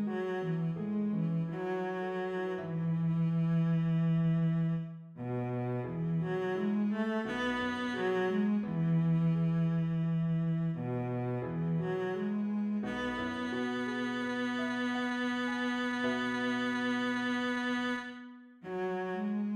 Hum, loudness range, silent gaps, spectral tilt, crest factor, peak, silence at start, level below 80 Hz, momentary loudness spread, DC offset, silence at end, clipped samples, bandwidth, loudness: none; 3 LU; none; -7.5 dB/octave; 12 dB; -22 dBFS; 0 s; -66 dBFS; 6 LU; under 0.1%; 0 s; under 0.1%; 7.6 kHz; -33 LUFS